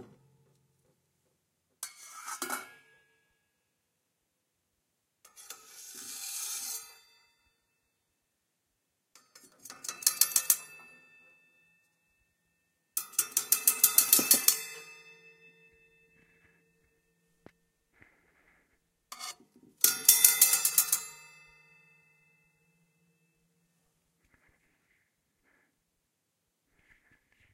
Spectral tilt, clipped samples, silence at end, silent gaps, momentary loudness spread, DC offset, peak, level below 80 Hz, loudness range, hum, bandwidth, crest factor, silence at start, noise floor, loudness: 2 dB/octave; under 0.1%; 6.4 s; none; 25 LU; under 0.1%; -2 dBFS; -84 dBFS; 19 LU; none; 16 kHz; 34 dB; 0 s; -81 dBFS; -25 LUFS